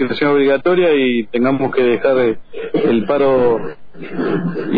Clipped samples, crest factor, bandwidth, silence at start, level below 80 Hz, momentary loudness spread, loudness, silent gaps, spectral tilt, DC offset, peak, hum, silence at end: under 0.1%; 10 dB; 5 kHz; 0 s; -50 dBFS; 9 LU; -15 LUFS; none; -9.5 dB/octave; 3%; -4 dBFS; none; 0 s